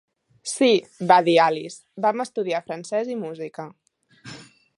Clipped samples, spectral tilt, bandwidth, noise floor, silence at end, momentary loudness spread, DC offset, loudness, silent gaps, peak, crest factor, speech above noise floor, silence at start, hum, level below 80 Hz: under 0.1%; -4 dB/octave; 11.5 kHz; -47 dBFS; 0.35 s; 23 LU; under 0.1%; -22 LUFS; none; -2 dBFS; 22 dB; 25 dB; 0.45 s; none; -76 dBFS